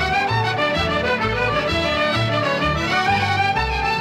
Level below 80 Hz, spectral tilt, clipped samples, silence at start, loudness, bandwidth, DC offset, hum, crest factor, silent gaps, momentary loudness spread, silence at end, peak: -34 dBFS; -5 dB/octave; under 0.1%; 0 s; -19 LUFS; 15.5 kHz; under 0.1%; none; 12 dB; none; 2 LU; 0 s; -8 dBFS